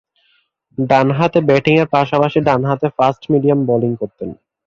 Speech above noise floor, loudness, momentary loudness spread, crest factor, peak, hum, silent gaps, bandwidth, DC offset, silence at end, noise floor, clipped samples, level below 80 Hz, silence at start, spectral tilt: 46 dB; -15 LUFS; 12 LU; 14 dB; -2 dBFS; none; none; 7.4 kHz; under 0.1%; 0.35 s; -60 dBFS; under 0.1%; -52 dBFS; 0.8 s; -8 dB/octave